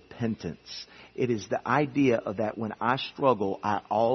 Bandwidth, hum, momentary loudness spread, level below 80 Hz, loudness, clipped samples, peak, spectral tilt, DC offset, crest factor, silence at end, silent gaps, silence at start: 6.4 kHz; none; 13 LU; -66 dBFS; -28 LUFS; under 0.1%; -8 dBFS; -6.5 dB/octave; under 0.1%; 20 dB; 0 s; none; 0.1 s